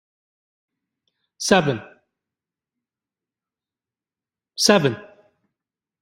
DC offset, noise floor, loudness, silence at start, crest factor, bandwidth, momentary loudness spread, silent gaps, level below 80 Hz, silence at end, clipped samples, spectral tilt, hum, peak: under 0.1%; under -90 dBFS; -19 LUFS; 1.4 s; 24 dB; 15.5 kHz; 18 LU; none; -62 dBFS; 1 s; under 0.1%; -3.5 dB/octave; none; -2 dBFS